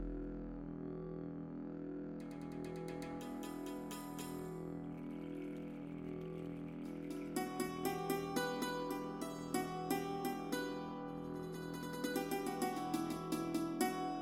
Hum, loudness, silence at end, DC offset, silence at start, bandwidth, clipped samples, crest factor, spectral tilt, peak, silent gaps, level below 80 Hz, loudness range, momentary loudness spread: none; -43 LUFS; 0 s; under 0.1%; 0 s; 16.5 kHz; under 0.1%; 20 dB; -5 dB/octave; -22 dBFS; none; -62 dBFS; 6 LU; 8 LU